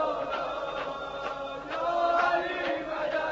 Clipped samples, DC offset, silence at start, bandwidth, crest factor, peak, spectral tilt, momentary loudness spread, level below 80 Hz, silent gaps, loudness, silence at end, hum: under 0.1%; under 0.1%; 0 s; 7.6 kHz; 16 dB; -14 dBFS; -1 dB/octave; 10 LU; -58 dBFS; none; -30 LUFS; 0 s; none